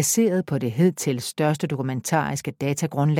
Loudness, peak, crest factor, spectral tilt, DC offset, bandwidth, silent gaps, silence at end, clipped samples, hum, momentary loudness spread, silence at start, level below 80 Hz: -23 LUFS; -6 dBFS; 18 dB; -5.5 dB/octave; under 0.1%; 17 kHz; none; 0 s; under 0.1%; none; 6 LU; 0 s; -62 dBFS